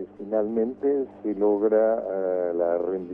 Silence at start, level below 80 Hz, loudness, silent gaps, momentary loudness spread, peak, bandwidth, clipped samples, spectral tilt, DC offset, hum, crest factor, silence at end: 0 s; -68 dBFS; -25 LUFS; none; 6 LU; -10 dBFS; 2.9 kHz; under 0.1%; -11 dB/octave; under 0.1%; 50 Hz at -55 dBFS; 14 dB; 0 s